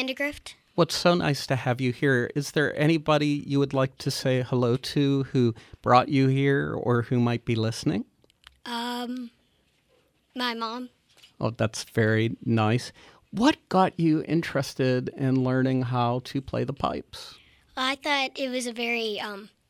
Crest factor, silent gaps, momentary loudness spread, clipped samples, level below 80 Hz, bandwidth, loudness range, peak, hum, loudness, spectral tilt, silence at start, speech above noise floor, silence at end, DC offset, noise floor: 20 dB; none; 11 LU; under 0.1%; -58 dBFS; 15 kHz; 8 LU; -6 dBFS; none; -26 LUFS; -6 dB/octave; 0 s; 42 dB; 0.2 s; under 0.1%; -67 dBFS